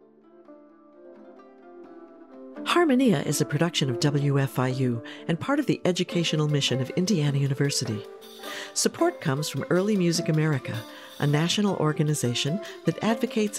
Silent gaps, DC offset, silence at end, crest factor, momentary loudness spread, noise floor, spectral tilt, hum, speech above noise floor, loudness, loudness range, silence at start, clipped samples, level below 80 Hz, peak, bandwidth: none; under 0.1%; 0 s; 18 dB; 11 LU; -53 dBFS; -5 dB/octave; none; 28 dB; -25 LUFS; 2 LU; 0.5 s; under 0.1%; -72 dBFS; -6 dBFS; 16 kHz